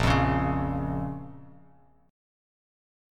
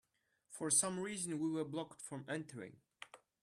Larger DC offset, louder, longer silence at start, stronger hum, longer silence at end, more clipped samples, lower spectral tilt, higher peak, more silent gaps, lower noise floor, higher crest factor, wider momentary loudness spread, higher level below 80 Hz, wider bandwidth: neither; first, -28 LUFS vs -39 LUFS; second, 0 s vs 0.5 s; neither; first, 1 s vs 0.25 s; neither; first, -7 dB/octave vs -3.5 dB/octave; first, -10 dBFS vs -20 dBFS; neither; second, -59 dBFS vs -77 dBFS; about the same, 20 dB vs 22 dB; second, 16 LU vs 23 LU; first, -40 dBFS vs -82 dBFS; second, 13 kHz vs 14.5 kHz